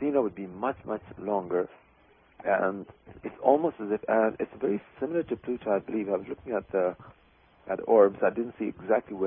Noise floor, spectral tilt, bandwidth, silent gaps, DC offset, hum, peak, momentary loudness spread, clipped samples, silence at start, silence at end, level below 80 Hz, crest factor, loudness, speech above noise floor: -61 dBFS; -11 dB/octave; 3.7 kHz; none; under 0.1%; none; -8 dBFS; 12 LU; under 0.1%; 0 s; 0 s; -64 dBFS; 22 dB; -29 LUFS; 33 dB